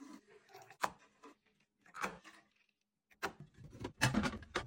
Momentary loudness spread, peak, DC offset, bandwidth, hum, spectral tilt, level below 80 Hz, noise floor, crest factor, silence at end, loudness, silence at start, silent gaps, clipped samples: 26 LU; -14 dBFS; under 0.1%; 16.5 kHz; none; -4 dB/octave; -60 dBFS; -82 dBFS; 30 dB; 0 s; -40 LUFS; 0 s; none; under 0.1%